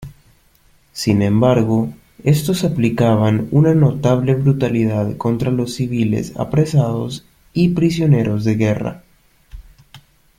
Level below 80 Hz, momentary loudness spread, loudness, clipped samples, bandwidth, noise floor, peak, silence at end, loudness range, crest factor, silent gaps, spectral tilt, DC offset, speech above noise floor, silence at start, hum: -44 dBFS; 9 LU; -17 LUFS; under 0.1%; 16 kHz; -54 dBFS; -2 dBFS; 0.4 s; 3 LU; 14 dB; none; -7.5 dB/octave; under 0.1%; 38 dB; 0 s; none